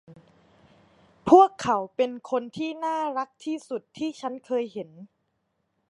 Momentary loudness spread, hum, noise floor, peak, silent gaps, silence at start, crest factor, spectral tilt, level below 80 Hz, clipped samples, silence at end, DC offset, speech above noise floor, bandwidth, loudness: 19 LU; none; -75 dBFS; -4 dBFS; none; 0.1 s; 24 dB; -5.5 dB/octave; -66 dBFS; under 0.1%; 0.85 s; under 0.1%; 51 dB; 11 kHz; -25 LUFS